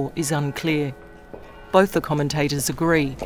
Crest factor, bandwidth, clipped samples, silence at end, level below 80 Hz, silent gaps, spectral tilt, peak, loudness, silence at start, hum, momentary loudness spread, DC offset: 20 dB; 16 kHz; under 0.1%; 0 s; -46 dBFS; none; -5 dB/octave; -2 dBFS; -22 LUFS; 0 s; none; 23 LU; under 0.1%